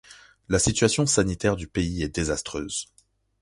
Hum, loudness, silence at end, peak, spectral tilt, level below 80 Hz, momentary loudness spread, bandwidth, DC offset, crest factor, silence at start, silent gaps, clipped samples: none; -25 LUFS; 0.55 s; -6 dBFS; -4 dB/octave; -42 dBFS; 10 LU; 11.5 kHz; under 0.1%; 20 dB; 0.1 s; none; under 0.1%